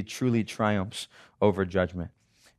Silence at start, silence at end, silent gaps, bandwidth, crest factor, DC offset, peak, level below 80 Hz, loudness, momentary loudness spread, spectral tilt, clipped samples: 0 s; 0.5 s; none; 13.5 kHz; 20 dB; under 0.1%; -8 dBFS; -60 dBFS; -28 LUFS; 13 LU; -6 dB/octave; under 0.1%